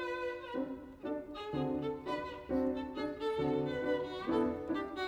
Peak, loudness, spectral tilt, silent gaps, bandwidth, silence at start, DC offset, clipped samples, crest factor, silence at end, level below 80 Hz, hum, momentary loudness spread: -20 dBFS; -37 LUFS; -7 dB/octave; none; 11 kHz; 0 s; under 0.1%; under 0.1%; 16 dB; 0 s; -60 dBFS; none; 7 LU